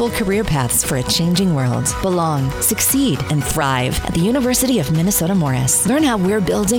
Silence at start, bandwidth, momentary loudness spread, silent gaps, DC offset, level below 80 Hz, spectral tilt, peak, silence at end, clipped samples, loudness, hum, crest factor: 0 s; over 20 kHz; 4 LU; none; under 0.1%; -34 dBFS; -4.5 dB/octave; -2 dBFS; 0 s; under 0.1%; -16 LUFS; none; 14 dB